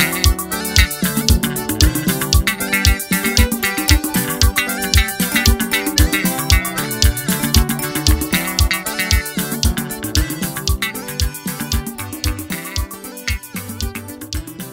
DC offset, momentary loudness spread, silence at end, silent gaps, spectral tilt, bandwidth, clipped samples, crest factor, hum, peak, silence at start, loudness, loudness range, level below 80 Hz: under 0.1%; 10 LU; 0 s; none; -3.5 dB/octave; 16.5 kHz; under 0.1%; 18 dB; none; 0 dBFS; 0 s; -17 LUFS; 7 LU; -22 dBFS